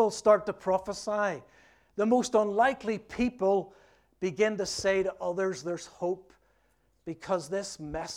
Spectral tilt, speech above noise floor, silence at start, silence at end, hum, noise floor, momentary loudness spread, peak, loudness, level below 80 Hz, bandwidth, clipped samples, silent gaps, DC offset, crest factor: -4.5 dB/octave; 41 dB; 0 s; 0 s; none; -70 dBFS; 13 LU; -10 dBFS; -29 LUFS; -60 dBFS; 14.5 kHz; under 0.1%; none; under 0.1%; 20 dB